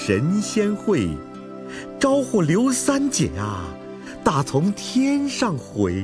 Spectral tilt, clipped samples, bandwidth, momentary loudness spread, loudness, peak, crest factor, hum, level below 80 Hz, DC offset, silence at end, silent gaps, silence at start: -5 dB/octave; under 0.1%; 11 kHz; 15 LU; -21 LUFS; -2 dBFS; 20 dB; none; -46 dBFS; under 0.1%; 0 s; none; 0 s